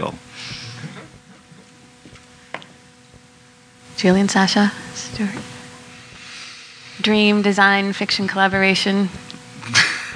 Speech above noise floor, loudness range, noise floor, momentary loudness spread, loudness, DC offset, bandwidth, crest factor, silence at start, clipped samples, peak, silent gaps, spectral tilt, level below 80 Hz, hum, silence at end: 31 dB; 19 LU; -49 dBFS; 22 LU; -17 LUFS; under 0.1%; 10.5 kHz; 20 dB; 0 s; under 0.1%; 0 dBFS; none; -4 dB/octave; -54 dBFS; none; 0 s